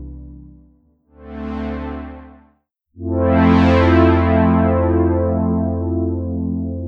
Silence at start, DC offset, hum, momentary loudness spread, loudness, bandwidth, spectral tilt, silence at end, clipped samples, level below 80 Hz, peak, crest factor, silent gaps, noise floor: 0 s; under 0.1%; none; 19 LU; -16 LUFS; 5.8 kHz; -9.5 dB/octave; 0 s; under 0.1%; -32 dBFS; -2 dBFS; 16 dB; none; -60 dBFS